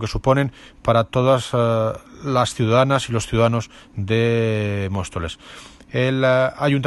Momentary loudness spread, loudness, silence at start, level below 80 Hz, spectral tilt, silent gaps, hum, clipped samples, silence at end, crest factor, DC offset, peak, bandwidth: 13 LU; -20 LUFS; 0 s; -42 dBFS; -6 dB/octave; none; none; under 0.1%; 0 s; 18 dB; under 0.1%; -2 dBFS; 12 kHz